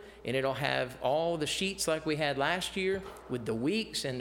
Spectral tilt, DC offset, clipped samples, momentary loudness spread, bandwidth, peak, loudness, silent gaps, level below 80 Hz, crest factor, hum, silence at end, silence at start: -4 dB/octave; under 0.1%; under 0.1%; 5 LU; 17 kHz; -12 dBFS; -32 LUFS; none; -58 dBFS; 20 dB; none; 0 s; 0 s